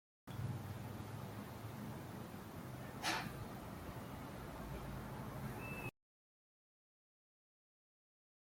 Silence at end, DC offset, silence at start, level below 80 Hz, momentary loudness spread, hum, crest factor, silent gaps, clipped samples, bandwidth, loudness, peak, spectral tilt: 2.6 s; under 0.1%; 0.25 s; -62 dBFS; 8 LU; none; 22 dB; none; under 0.1%; 16.5 kHz; -48 LUFS; -26 dBFS; -5 dB/octave